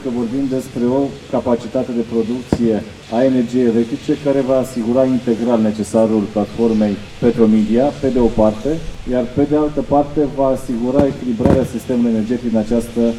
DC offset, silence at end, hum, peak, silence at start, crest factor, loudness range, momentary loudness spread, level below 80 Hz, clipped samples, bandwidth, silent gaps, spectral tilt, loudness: under 0.1%; 0 s; none; 0 dBFS; 0 s; 16 dB; 2 LU; 6 LU; -36 dBFS; under 0.1%; 12.5 kHz; none; -7.5 dB/octave; -17 LUFS